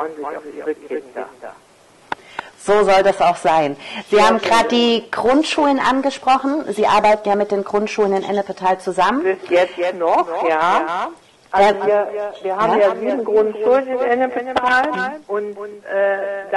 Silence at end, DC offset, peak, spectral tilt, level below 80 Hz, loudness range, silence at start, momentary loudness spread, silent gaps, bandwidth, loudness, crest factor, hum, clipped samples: 0 s; under 0.1%; -2 dBFS; -4 dB/octave; -54 dBFS; 3 LU; 0 s; 14 LU; none; 12 kHz; -17 LUFS; 16 dB; none; under 0.1%